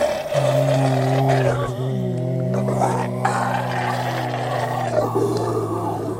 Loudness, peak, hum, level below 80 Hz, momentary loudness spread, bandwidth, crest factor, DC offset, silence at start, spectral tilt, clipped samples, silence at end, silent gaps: -21 LUFS; -2 dBFS; none; -50 dBFS; 5 LU; 16 kHz; 18 dB; under 0.1%; 0 s; -6.5 dB/octave; under 0.1%; 0 s; none